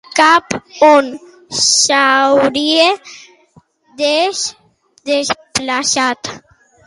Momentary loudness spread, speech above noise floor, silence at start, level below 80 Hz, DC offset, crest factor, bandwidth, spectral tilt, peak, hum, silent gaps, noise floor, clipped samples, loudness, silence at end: 14 LU; 37 dB; 0.15 s; -56 dBFS; under 0.1%; 14 dB; 11.5 kHz; -1 dB/octave; 0 dBFS; none; none; -50 dBFS; under 0.1%; -13 LUFS; 0.5 s